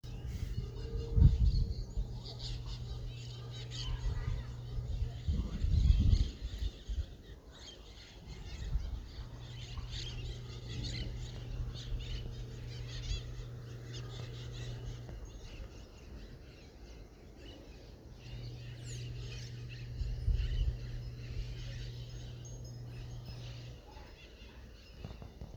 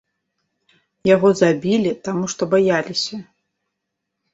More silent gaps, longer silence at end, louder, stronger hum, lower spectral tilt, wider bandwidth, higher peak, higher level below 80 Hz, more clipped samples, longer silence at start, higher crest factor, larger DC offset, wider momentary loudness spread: neither; second, 0 s vs 1.1 s; second, -40 LUFS vs -18 LUFS; neither; about the same, -6 dB/octave vs -5 dB/octave; about the same, 8 kHz vs 8 kHz; second, -12 dBFS vs -2 dBFS; first, -40 dBFS vs -62 dBFS; neither; second, 0.05 s vs 1.05 s; first, 24 dB vs 18 dB; neither; first, 18 LU vs 9 LU